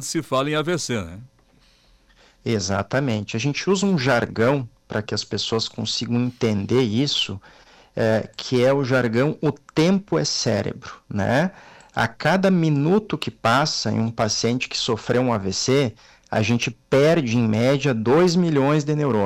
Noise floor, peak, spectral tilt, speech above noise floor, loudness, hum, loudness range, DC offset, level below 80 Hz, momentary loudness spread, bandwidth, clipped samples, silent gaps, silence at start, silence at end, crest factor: -57 dBFS; -10 dBFS; -5 dB/octave; 36 dB; -21 LUFS; none; 3 LU; under 0.1%; -54 dBFS; 8 LU; 15.5 kHz; under 0.1%; none; 0 s; 0 s; 12 dB